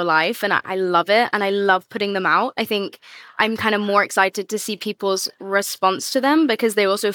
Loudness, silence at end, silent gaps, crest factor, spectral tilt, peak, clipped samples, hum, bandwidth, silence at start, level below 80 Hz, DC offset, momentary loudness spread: -19 LUFS; 0 s; none; 16 dB; -3 dB/octave; -4 dBFS; under 0.1%; none; 19.5 kHz; 0 s; -72 dBFS; under 0.1%; 7 LU